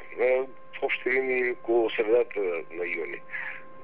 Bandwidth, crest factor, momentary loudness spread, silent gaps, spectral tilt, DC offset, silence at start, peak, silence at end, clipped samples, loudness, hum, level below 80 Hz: 4.3 kHz; 14 dB; 10 LU; none; -7.5 dB/octave; 0.8%; 0 s; -12 dBFS; 0 s; under 0.1%; -27 LUFS; none; -74 dBFS